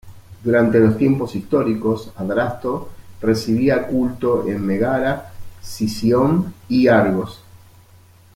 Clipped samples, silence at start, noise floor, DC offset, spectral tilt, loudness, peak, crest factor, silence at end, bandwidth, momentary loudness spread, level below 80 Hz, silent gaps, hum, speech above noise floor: under 0.1%; 0.05 s; -48 dBFS; under 0.1%; -7 dB/octave; -19 LUFS; -2 dBFS; 16 dB; 0.8 s; 16.5 kHz; 11 LU; -48 dBFS; none; none; 30 dB